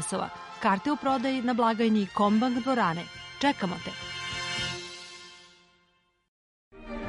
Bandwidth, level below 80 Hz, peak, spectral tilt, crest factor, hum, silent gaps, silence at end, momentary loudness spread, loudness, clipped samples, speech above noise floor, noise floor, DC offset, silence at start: 11.5 kHz; -58 dBFS; -10 dBFS; -4.5 dB/octave; 18 dB; none; 6.28-6.71 s; 0 s; 16 LU; -28 LUFS; under 0.1%; 42 dB; -69 dBFS; under 0.1%; 0 s